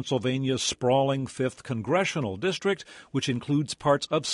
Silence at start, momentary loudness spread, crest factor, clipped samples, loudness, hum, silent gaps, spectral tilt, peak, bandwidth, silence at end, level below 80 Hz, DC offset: 0 s; 7 LU; 18 dB; under 0.1%; -27 LUFS; none; none; -5 dB/octave; -10 dBFS; 11.5 kHz; 0 s; -58 dBFS; under 0.1%